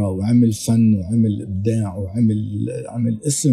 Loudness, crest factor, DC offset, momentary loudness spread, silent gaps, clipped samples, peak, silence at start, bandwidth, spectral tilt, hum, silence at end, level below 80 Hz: -19 LUFS; 12 dB; under 0.1%; 8 LU; none; under 0.1%; -6 dBFS; 0 s; 13.5 kHz; -7 dB/octave; none; 0 s; -50 dBFS